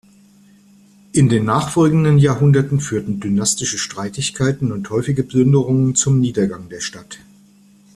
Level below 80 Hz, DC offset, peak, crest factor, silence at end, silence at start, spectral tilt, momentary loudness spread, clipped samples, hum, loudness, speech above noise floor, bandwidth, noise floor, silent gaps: -48 dBFS; under 0.1%; -2 dBFS; 14 dB; 0.8 s; 1.15 s; -5.5 dB/octave; 13 LU; under 0.1%; none; -17 LUFS; 33 dB; 12.5 kHz; -49 dBFS; none